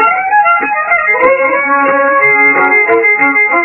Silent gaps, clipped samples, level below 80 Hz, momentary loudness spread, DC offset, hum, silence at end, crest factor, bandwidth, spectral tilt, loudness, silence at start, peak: none; 0.1%; -54 dBFS; 4 LU; under 0.1%; none; 0 s; 10 dB; 4 kHz; -6.5 dB/octave; -8 LUFS; 0 s; 0 dBFS